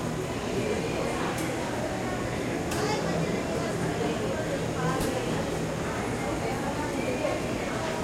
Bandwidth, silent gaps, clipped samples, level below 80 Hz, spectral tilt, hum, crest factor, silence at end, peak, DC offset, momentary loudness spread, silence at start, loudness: 16.5 kHz; none; under 0.1%; -46 dBFS; -5 dB/octave; none; 12 dB; 0 s; -16 dBFS; under 0.1%; 3 LU; 0 s; -29 LUFS